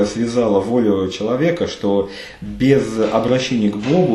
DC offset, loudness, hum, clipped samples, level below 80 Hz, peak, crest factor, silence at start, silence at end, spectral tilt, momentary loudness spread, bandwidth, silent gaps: under 0.1%; -17 LUFS; none; under 0.1%; -44 dBFS; 0 dBFS; 16 dB; 0 s; 0 s; -6.5 dB/octave; 5 LU; 12.5 kHz; none